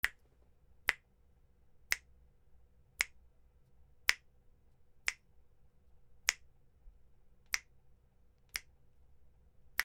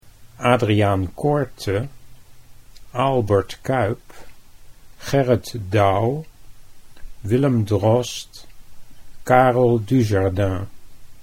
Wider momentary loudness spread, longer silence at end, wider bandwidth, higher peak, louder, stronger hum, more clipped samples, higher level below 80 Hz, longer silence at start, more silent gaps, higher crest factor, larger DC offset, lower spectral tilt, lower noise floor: second, 12 LU vs 15 LU; about the same, 0 s vs 0 s; about the same, 16 kHz vs 16 kHz; second, -4 dBFS vs 0 dBFS; second, -38 LUFS vs -20 LUFS; neither; neither; second, -64 dBFS vs -46 dBFS; about the same, 0.05 s vs 0.05 s; neither; first, 40 dB vs 20 dB; neither; second, 1.5 dB/octave vs -7 dB/octave; first, -67 dBFS vs -42 dBFS